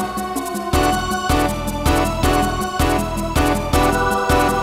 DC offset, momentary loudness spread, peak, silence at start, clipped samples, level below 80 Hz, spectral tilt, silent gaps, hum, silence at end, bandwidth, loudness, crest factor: under 0.1%; 5 LU; -4 dBFS; 0 s; under 0.1%; -26 dBFS; -5 dB/octave; none; none; 0 s; 16 kHz; -18 LUFS; 14 dB